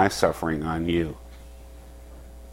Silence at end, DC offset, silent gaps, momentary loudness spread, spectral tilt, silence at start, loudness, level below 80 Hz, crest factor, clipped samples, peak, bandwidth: 0 s; under 0.1%; none; 22 LU; -5.5 dB/octave; 0 s; -26 LUFS; -42 dBFS; 22 dB; under 0.1%; -6 dBFS; 16.5 kHz